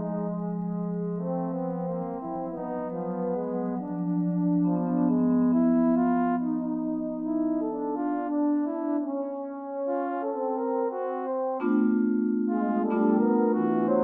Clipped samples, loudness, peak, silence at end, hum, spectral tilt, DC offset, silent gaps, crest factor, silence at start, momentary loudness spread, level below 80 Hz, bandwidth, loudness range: under 0.1%; -27 LUFS; -12 dBFS; 0 s; none; -13 dB/octave; under 0.1%; none; 14 dB; 0 s; 9 LU; -64 dBFS; 3.1 kHz; 6 LU